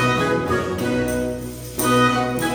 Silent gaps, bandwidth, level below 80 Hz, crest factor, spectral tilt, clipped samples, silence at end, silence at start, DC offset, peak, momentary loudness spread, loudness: none; over 20 kHz; -40 dBFS; 16 dB; -5 dB/octave; under 0.1%; 0 s; 0 s; under 0.1%; -4 dBFS; 10 LU; -20 LUFS